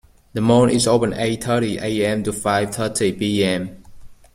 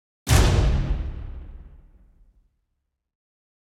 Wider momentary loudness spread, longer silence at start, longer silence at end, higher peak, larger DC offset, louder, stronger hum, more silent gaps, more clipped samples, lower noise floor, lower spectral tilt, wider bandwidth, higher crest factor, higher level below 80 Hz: second, 7 LU vs 23 LU; about the same, 0.35 s vs 0.25 s; second, 0.2 s vs 2 s; about the same, -4 dBFS vs -4 dBFS; neither; first, -19 LUFS vs -22 LUFS; neither; neither; neither; second, -39 dBFS vs -78 dBFS; about the same, -5 dB/octave vs -5 dB/octave; about the same, 16 kHz vs 16.5 kHz; about the same, 16 dB vs 20 dB; second, -46 dBFS vs -28 dBFS